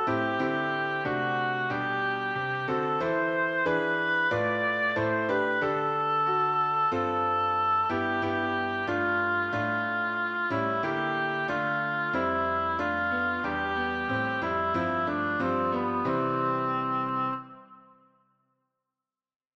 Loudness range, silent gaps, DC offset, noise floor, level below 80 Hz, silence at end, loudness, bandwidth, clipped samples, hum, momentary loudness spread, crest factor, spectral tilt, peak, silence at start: 3 LU; none; under 0.1%; -90 dBFS; -60 dBFS; 1.8 s; -27 LUFS; 7.8 kHz; under 0.1%; none; 3 LU; 12 dB; -7 dB/octave; -16 dBFS; 0 s